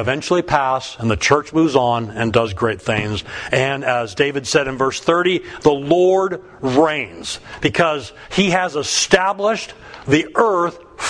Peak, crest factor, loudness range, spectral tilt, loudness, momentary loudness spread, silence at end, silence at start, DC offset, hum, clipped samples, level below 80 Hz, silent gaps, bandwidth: 0 dBFS; 18 dB; 1 LU; -4.5 dB/octave; -18 LUFS; 8 LU; 0 s; 0 s; under 0.1%; none; under 0.1%; -44 dBFS; none; 10.5 kHz